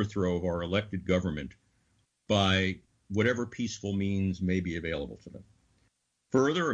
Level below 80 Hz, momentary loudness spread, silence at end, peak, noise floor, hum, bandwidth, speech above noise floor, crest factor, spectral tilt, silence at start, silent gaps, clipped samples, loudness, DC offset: -54 dBFS; 13 LU; 0 s; -14 dBFS; -74 dBFS; none; 8 kHz; 44 dB; 18 dB; -5.5 dB/octave; 0 s; none; under 0.1%; -30 LUFS; under 0.1%